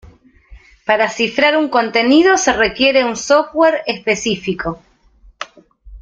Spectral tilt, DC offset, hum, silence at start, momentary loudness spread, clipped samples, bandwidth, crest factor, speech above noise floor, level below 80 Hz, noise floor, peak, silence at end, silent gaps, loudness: -3 dB/octave; under 0.1%; none; 0.05 s; 18 LU; under 0.1%; 9.2 kHz; 14 dB; 34 dB; -46 dBFS; -48 dBFS; -2 dBFS; 0.05 s; none; -14 LUFS